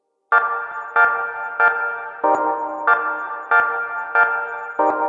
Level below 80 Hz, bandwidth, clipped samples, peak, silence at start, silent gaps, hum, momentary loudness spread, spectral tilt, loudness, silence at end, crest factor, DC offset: -70 dBFS; 7.4 kHz; under 0.1%; -2 dBFS; 0.3 s; none; none; 8 LU; -4.5 dB/octave; -19 LUFS; 0 s; 18 dB; under 0.1%